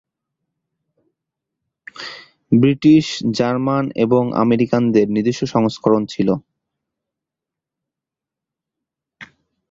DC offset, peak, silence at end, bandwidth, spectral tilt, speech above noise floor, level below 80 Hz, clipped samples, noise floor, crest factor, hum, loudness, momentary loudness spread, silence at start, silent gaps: under 0.1%; -2 dBFS; 0.45 s; 7.8 kHz; -7 dB/octave; 71 dB; -56 dBFS; under 0.1%; -86 dBFS; 18 dB; none; -17 LUFS; 10 LU; 1.95 s; none